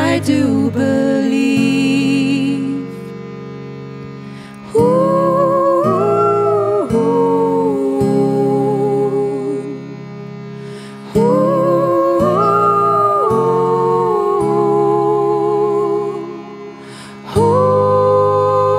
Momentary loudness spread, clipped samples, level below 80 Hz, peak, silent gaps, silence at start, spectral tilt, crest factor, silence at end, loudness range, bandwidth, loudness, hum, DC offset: 17 LU; under 0.1%; -48 dBFS; -2 dBFS; none; 0 s; -7 dB/octave; 14 dB; 0 s; 5 LU; 14.5 kHz; -14 LUFS; none; under 0.1%